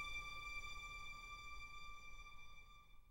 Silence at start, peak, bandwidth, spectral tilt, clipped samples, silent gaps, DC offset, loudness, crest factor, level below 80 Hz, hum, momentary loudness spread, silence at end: 0 s; -38 dBFS; 16 kHz; -1.5 dB/octave; under 0.1%; none; under 0.1%; -52 LUFS; 14 dB; -60 dBFS; none; 14 LU; 0 s